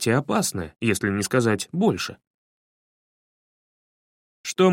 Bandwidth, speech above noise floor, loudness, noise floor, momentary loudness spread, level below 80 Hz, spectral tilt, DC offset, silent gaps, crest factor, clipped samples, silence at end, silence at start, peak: 16.5 kHz; over 68 dB; -24 LUFS; under -90 dBFS; 9 LU; -58 dBFS; -5 dB/octave; under 0.1%; 2.27-4.44 s; 20 dB; under 0.1%; 0 s; 0 s; -6 dBFS